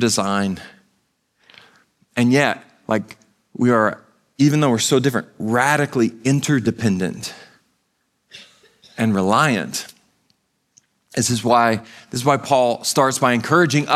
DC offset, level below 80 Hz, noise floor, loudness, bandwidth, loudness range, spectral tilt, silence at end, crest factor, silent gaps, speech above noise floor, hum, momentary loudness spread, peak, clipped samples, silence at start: under 0.1%; -62 dBFS; -69 dBFS; -18 LUFS; 15 kHz; 5 LU; -4.5 dB/octave; 0 s; 18 dB; none; 51 dB; none; 12 LU; 0 dBFS; under 0.1%; 0 s